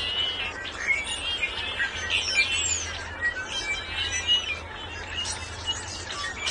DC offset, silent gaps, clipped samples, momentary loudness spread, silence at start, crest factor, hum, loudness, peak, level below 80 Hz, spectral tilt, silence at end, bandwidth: under 0.1%; none; under 0.1%; 9 LU; 0 s; 18 dB; none; -26 LUFS; -12 dBFS; -48 dBFS; -0.5 dB/octave; 0 s; 11.5 kHz